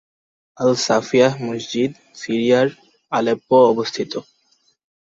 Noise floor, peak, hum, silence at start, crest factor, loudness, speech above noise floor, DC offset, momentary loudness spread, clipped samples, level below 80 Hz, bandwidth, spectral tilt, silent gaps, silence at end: -62 dBFS; -2 dBFS; none; 0.6 s; 18 dB; -18 LUFS; 44 dB; under 0.1%; 12 LU; under 0.1%; -62 dBFS; 7.8 kHz; -5 dB/octave; none; 0.8 s